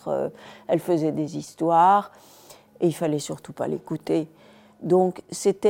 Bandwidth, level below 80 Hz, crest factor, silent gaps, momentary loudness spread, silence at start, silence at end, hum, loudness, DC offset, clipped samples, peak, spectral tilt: 16.5 kHz; -68 dBFS; 16 dB; none; 15 LU; 0.05 s; 0 s; none; -24 LUFS; under 0.1%; under 0.1%; -8 dBFS; -6 dB/octave